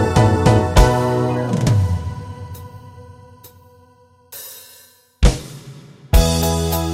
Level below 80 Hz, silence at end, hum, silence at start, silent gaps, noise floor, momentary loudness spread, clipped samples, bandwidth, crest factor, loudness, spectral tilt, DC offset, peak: -24 dBFS; 0 s; none; 0 s; none; -51 dBFS; 23 LU; under 0.1%; 16.5 kHz; 18 dB; -17 LUFS; -6 dB/octave; under 0.1%; 0 dBFS